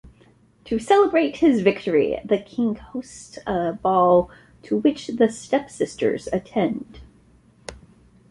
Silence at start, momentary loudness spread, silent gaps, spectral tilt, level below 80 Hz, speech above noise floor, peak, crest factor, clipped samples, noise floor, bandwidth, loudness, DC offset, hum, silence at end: 0.05 s; 17 LU; none; -6 dB/octave; -52 dBFS; 34 dB; -4 dBFS; 18 dB; under 0.1%; -55 dBFS; 11.5 kHz; -21 LUFS; under 0.1%; none; 0.55 s